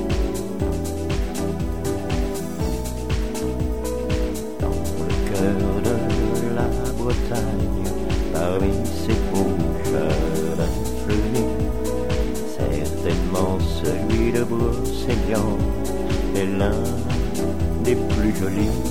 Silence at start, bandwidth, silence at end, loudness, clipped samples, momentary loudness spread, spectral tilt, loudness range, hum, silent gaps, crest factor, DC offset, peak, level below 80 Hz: 0 s; 17 kHz; 0 s; -23 LUFS; under 0.1%; 5 LU; -6.5 dB/octave; 3 LU; none; none; 16 dB; 4%; -6 dBFS; -28 dBFS